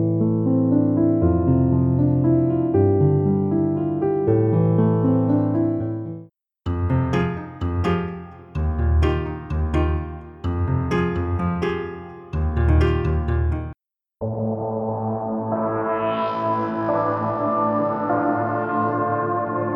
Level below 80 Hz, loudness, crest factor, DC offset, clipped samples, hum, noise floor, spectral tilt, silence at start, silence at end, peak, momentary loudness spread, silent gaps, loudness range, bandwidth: -32 dBFS; -21 LUFS; 14 dB; under 0.1%; under 0.1%; none; -48 dBFS; -10 dB/octave; 0 s; 0 s; -6 dBFS; 10 LU; none; 6 LU; 6.8 kHz